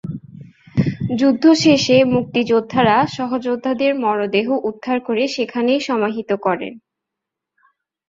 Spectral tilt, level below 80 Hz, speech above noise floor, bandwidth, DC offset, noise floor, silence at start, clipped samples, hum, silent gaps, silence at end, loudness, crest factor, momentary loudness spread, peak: -5.5 dB/octave; -54 dBFS; 66 dB; 7.8 kHz; under 0.1%; -82 dBFS; 0.05 s; under 0.1%; none; none; 1.3 s; -17 LUFS; 16 dB; 9 LU; -2 dBFS